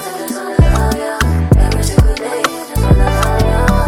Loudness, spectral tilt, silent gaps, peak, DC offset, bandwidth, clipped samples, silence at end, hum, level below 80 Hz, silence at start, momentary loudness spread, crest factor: -14 LUFS; -6 dB/octave; none; 0 dBFS; under 0.1%; 16 kHz; under 0.1%; 0 s; none; -16 dBFS; 0 s; 6 LU; 12 dB